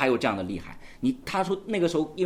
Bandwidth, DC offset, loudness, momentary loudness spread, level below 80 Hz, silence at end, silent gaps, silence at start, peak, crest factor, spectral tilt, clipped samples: 15 kHz; under 0.1%; -28 LUFS; 10 LU; -52 dBFS; 0 s; none; 0 s; -8 dBFS; 20 dB; -5.5 dB/octave; under 0.1%